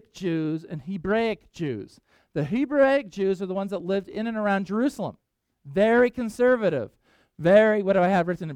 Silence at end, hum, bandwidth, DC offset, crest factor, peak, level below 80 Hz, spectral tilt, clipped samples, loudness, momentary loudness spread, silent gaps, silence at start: 0 s; none; 13 kHz; under 0.1%; 18 dB; -6 dBFS; -58 dBFS; -7 dB/octave; under 0.1%; -24 LUFS; 12 LU; none; 0.15 s